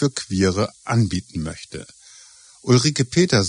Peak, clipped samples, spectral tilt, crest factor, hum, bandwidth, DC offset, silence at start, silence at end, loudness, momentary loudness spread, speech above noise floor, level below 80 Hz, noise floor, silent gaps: -4 dBFS; under 0.1%; -5 dB/octave; 18 dB; none; 10.5 kHz; under 0.1%; 0 s; 0 s; -20 LUFS; 18 LU; 28 dB; -48 dBFS; -47 dBFS; none